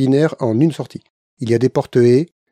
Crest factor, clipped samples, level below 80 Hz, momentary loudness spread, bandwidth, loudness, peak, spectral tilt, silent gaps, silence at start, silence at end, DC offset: 14 dB; under 0.1%; -58 dBFS; 15 LU; 10.5 kHz; -16 LUFS; -2 dBFS; -8 dB/octave; 1.10-1.37 s; 0 s; 0.25 s; under 0.1%